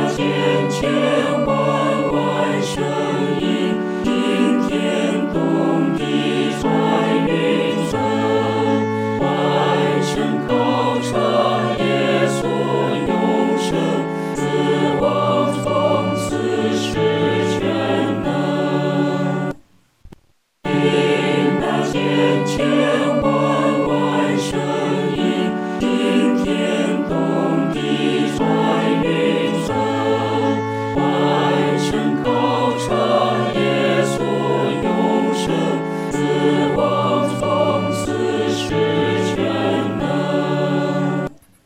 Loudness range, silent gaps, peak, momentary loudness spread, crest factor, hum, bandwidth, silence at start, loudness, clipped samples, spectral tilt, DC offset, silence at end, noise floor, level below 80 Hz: 2 LU; none; -4 dBFS; 4 LU; 14 dB; none; 15.5 kHz; 0 s; -18 LUFS; under 0.1%; -6 dB/octave; under 0.1%; 0.3 s; -57 dBFS; -46 dBFS